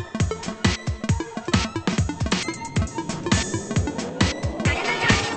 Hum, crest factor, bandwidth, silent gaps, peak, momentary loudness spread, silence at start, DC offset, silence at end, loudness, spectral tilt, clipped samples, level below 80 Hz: none; 22 dB; 8.8 kHz; none; -2 dBFS; 5 LU; 0 s; under 0.1%; 0 s; -24 LUFS; -4.5 dB/octave; under 0.1%; -36 dBFS